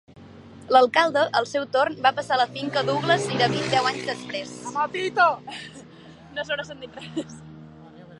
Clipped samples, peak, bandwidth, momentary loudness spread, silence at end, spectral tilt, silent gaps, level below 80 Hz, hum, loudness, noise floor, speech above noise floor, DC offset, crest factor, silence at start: under 0.1%; -4 dBFS; 11.5 kHz; 17 LU; 0.05 s; -4 dB/octave; none; -62 dBFS; none; -23 LUFS; -46 dBFS; 23 dB; under 0.1%; 20 dB; 0.15 s